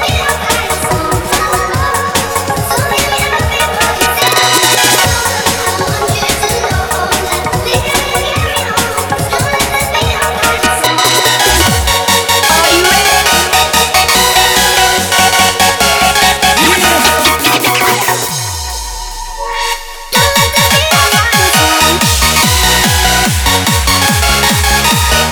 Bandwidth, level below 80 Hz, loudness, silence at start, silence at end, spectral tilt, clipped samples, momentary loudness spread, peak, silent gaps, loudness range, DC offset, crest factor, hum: over 20 kHz; -24 dBFS; -9 LUFS; 0 s; 0 s; -2 dB/octave; 0.1%; 6 LU; 0 dBFS; none; 5 LU; under 0.1%; 10 dB; none